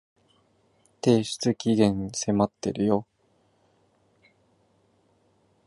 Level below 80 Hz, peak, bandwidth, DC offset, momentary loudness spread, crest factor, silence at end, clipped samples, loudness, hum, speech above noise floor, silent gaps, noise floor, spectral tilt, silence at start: -58 dBFS; -6 dBFS; 11.5 kHz; under 0.1%; 5 LU; 22 dB; 2.65 s; under 0.1%; -25 LUFS; none; 43 dB; none; -66 dBFS; -5.5 dB/octave; 1.05 s